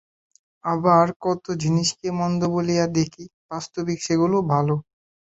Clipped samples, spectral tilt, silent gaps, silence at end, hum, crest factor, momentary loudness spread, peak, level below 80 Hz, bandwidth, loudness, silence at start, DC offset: under 0.1%; -6 dB/octave; 1.16-1.20 s, 3.34-3.49 s; 0.5 s; none; 18 dB; 11 LU; -6 dBFS; -58 dBFS; 8 kHz; -22 LUFS; 0.65 s; under 0.1%